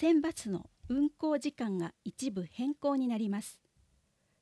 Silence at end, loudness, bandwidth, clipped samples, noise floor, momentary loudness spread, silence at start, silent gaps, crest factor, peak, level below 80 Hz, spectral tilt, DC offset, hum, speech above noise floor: 0.9 s; -34 LUFS; 11 kHz; under 0.1%; -73 dBFS; 9 LU; 0 s; none; 16 dB; -18 dBFS; -66 dBFS; -6 dB/octave; under 0.1%; none; 40 dB